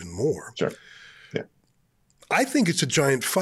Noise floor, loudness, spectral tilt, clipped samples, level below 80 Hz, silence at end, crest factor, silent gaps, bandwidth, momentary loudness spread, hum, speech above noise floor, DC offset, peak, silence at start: -66 dBFS; -25 LUFS; -4 dB/octave; under 0.1%; -64 dBFS; 0 s; 16 dB; none; 16.5 kHz; 13 LU; none; 42 dB; under 0.1%; -10 dBFS; 0 s